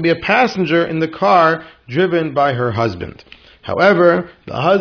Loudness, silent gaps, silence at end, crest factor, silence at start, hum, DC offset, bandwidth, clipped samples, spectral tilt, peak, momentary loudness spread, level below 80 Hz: -15 LUFS; none; 0 s; 16 dB; 0 s; none; under 0.1%; 5.4 kHz; under 0.1%; -7 dB/octave; 0 dBFS; 12 LU; -50 dBFS